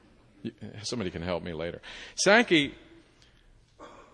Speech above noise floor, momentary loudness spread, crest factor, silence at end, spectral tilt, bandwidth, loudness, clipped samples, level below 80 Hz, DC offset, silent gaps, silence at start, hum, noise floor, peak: 31 dB; 21 LU; 24 dB; 0.15 s; -3.5 dB/octave; 10.5 kHz; -27 LUFS; under 0.1%; -58 dBFS; under 0.1%; none; 0.45 s; none; -59 dBFS; -6 dBFS